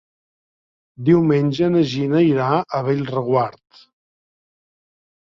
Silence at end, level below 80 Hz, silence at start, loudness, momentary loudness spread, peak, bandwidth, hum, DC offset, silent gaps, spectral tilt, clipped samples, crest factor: 1.7 s; -58 dBFS; 1 s; -18 LUFS; 6 LU; -4 dBFS; 7.2 kHz; none; under 0.1%; none; -8 dB/octave; under 0.1%; 16 dB